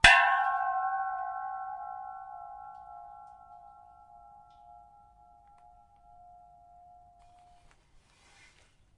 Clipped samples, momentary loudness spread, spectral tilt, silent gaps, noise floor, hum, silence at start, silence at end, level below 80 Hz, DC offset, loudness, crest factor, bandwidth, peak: under 0.1%; 27 LU; -1 dB/octave; none; -63 dBFS; none; 0.05 s; 5.4 s; -52 dBFS; under 0.1%; -29 LUFS; 30 dB; 11 kHz; -2 dBFS